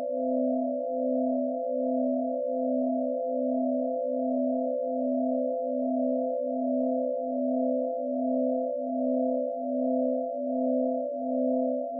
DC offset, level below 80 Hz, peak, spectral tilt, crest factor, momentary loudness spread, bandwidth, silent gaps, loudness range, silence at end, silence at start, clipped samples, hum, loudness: under 0.1%; under -90 dBFS; -18 dBFS; 5 dB/octave; 10 dB; 3 LU; 0.8 kHz; none; 0 LU; 0 s; 0 s; under 0.1%; none; -29 LUFS